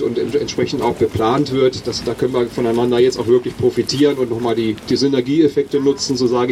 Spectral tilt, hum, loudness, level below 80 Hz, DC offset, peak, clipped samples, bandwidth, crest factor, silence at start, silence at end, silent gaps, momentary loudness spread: -5.5 dB/octave; none; -17 LUFS; -46 dBFS; under 0.1%; -2 dBFS; under 0.1%; 14 kHz; 14 dB; 0 s; 0 s; none; 4 LU